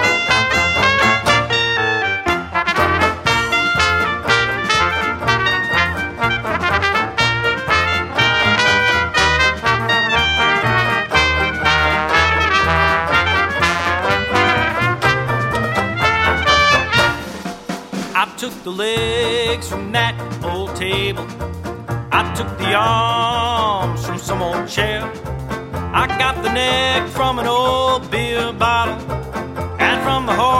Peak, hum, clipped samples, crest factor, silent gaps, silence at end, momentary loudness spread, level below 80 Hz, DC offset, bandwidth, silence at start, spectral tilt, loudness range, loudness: 0 dBFS; none; under 0.1%; 16 dB; none; 0 s; 11 LU; -34 dBFS; under 0.1%; 16.5 kHz; 0 s; -4 dB/octave; 6 LU; -16 LUFS